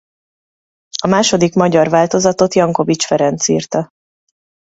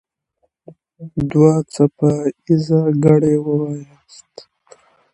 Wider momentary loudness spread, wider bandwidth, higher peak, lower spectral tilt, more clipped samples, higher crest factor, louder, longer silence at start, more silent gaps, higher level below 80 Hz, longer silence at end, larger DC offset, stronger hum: about the same, 9 LU vs 11 LU; second, 8 kHz vs 10.5 kHz; about the same, 0 dBFS vs 0 dBFS; second, -4.5 dB/octave vs -8.5 dB/octave; neither; about the same, 16 dB vs 18 dB; about the same, -14 LUFS vs -16 LUFS; about the same, 0.95 s vs 1 s; neither; about the same, -52 dBFS vs -50 dBFS; second, 0.85 s vs 1.3 s; neither; neither